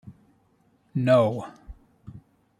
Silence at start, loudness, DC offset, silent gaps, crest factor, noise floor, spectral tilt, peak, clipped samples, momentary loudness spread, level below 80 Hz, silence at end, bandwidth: 0.05 s; -23 LUFS; under 0.1%; none; 20 dB; -64 dBFS; -8 dB/octave; -8 dBFS; under 0.1%; 23 LU; -54 dBFS; 0.4 s; 11.5 kHz